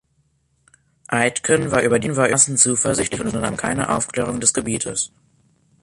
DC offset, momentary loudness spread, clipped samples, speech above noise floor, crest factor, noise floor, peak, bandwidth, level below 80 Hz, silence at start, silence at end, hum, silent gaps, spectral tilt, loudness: under 0.1%; 9 LU; under 0.1%; 45 dB; 20 dB; -65 dBFS; 0 dBFS; 11.5 kHz; -48 dBFS; 1.1 s; 0.75 s; none; none; -3.5 dB/octave; -18 LUFS